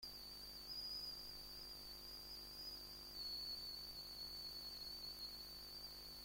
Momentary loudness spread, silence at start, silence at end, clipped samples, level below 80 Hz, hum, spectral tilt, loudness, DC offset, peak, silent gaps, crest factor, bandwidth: 6 LU; 0 s; 0 s; under 0.1%; -68 dBFS; 50 Hz at -65 dBFS; -1.5 dB/octave; -50 LUFS; under 0.1%; -40 dBFS; none; 14 dB; 16.5 kHz